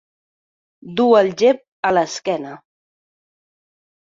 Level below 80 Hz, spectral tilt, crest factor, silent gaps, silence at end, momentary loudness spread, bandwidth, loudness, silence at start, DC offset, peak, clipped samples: -64 dBFS; -4.5 dB/octave; 18 dB; 1.68-1.83 s; 1.55 s; 13 LU; 7.8 kHz; -17 LUFS; 0.85 s; under 0.1%; -2 dBFS; under 0.1%